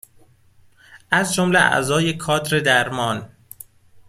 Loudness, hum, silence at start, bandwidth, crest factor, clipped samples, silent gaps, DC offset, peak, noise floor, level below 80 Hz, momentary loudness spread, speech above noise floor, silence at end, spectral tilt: -18 LUFS; none; 0.9 s; 16 kHz; 20 dB; under 0.1%; none; under 0.1%; -2 dBFS; -53 dBFS; -56 dBFS; 18 LU; 34 dB; 0.8 s; -4 dB/octave